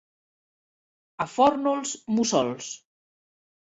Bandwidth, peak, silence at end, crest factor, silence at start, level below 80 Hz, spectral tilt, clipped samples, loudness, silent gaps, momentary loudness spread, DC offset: 8 kHz; -8 dBFS; 0.9 s; 20 dB; 1.2 s; -66 dBFS; -4 dB/octave; under 0.1%; -25 LUFS; none; 15 LU; under 0.1%